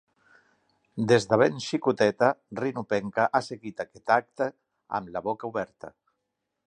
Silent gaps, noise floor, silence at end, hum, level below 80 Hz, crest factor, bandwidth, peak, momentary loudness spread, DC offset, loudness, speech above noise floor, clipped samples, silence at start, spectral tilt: none; -82 dBFS; 0.8 s; none; -66 dBFS; 22 dB; 10.5 kHz; -6 dBFS; 14 LU; under 0.1%; -27 LUFS; 55 dB; under 0.1%; 0.95 s; -5.5 dB/octave